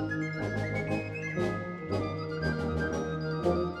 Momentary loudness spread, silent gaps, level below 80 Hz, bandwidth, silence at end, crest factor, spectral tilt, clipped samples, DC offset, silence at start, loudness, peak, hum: 4 LU; none; -48 dBFS; 11 kHz; 0 s; 16 dB; -7 dB/octave; under 0.1%; under 0.1%; 0 s; -32 LUFS; -16 dBFS; none